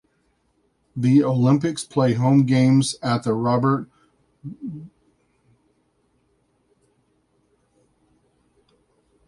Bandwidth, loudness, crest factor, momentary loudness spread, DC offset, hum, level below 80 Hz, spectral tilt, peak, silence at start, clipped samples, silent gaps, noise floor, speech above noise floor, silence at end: 11.5 kHz; -19 LUFS; 18 dB; 20 LU; under 0.1%; none; -60 dBFS; -7 dB/octave; -6 dBFS; 0.95 s; under 0.1%; none; -67 dBFS; 48 dB; 4.4 s